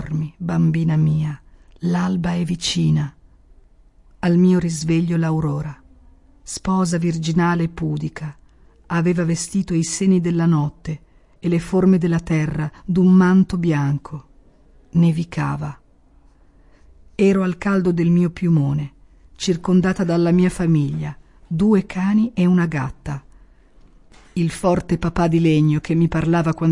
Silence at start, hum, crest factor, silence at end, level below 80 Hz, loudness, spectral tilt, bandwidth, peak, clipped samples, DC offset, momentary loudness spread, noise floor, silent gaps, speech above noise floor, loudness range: 0 s; none; 14 dB; 0 s; -44 dBFS; -19 LUFS; -7 dB/octave; 11.5 kHz; -4 dBFS; under 0.1%; under 0.1%; 12 LU; -52 dBFS; none; 34 dB; 4 LU